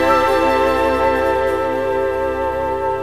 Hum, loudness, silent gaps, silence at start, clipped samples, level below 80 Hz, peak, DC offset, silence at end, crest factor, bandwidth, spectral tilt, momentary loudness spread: none; -17 LUFS; none; 0 s; under 0.1%; -36 dBFS; -2 dBFS; 0.9%; 0 s; 14 dB; 16 kHz; -5.5 dB/octave; 6 LU